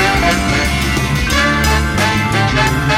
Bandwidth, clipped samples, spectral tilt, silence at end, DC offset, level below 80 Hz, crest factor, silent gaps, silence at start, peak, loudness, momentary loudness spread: 17 kHz; under 0.1%; -4.5 dB/octave; 0 s; under 0.1%; -22 dBFS; 12 dB; none; 0 s; -2 dBFS; -13 LUFS; 3 LU